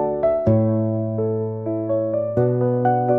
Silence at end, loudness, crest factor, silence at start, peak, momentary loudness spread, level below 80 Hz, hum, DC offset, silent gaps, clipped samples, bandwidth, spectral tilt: 0 s; -21 LUFS; 12 dB; 0 s; -6 dBFS; 6 LU; -50 dBFS; none; 0.1%; none; under 0.1%; 3.2 kHz; -12.5 dB/octave